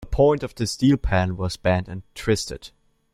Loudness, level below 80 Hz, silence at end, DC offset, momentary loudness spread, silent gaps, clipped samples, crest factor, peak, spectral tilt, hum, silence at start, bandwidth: -23 LUFS; -36 dBFS; 0.45 s; under 0.1%; 12 LU; none; under 0.1%; 18 dB; -4 dBFS; -6 dB/octave; none; 0 s; 14.5 kHz